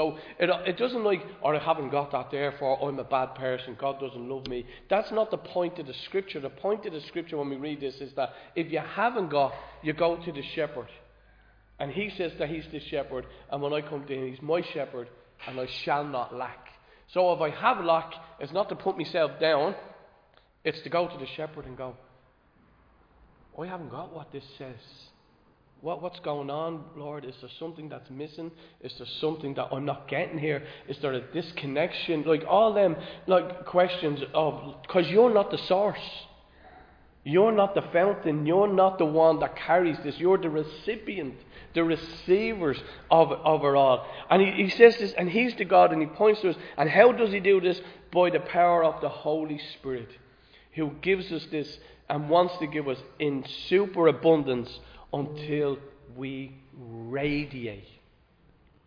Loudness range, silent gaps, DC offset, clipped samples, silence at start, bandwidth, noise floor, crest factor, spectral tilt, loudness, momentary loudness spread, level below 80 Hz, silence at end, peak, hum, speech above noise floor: 14 LU; none; under 0.1%; under 0.1%; 0 s; 5.2 kHz; -62 dBFS; 24 dB; -7.5 dB/octave; -27 LUFS; 17 LU; -60 dBFS; 1 s; -2 dBFS; none; 35 dB